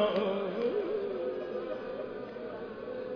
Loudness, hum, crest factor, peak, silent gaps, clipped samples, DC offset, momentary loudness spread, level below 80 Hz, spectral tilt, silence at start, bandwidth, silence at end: -35 LUFS; none; 16 dB; -18 dBFS; none; under 0.1%; under 0.1%; 9 LU; -66 dBFS; -4 dB/octave; 0 s; 5.4 kHz; 0 s